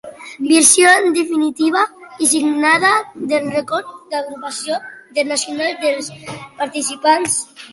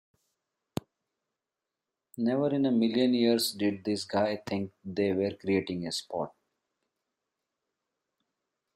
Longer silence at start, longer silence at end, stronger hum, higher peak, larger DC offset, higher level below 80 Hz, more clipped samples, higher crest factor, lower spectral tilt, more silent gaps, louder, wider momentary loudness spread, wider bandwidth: second, 0.05 s vs 2.15 s; second, 0.05 s vs 2.5 s; neither; first, 0 dBFS vs -12 dBFS; neither; first, -62 dBFS vs -74 dBFS; neither; about the same, 16 dB vs 18 dB; second, -1.5 dB/octave vs -5 dB/octave; neither; first, -16 LUFS vs -29 LUFS; about the same, 15 LU vs 15 LU; second, 12 kHz vs 16 kHz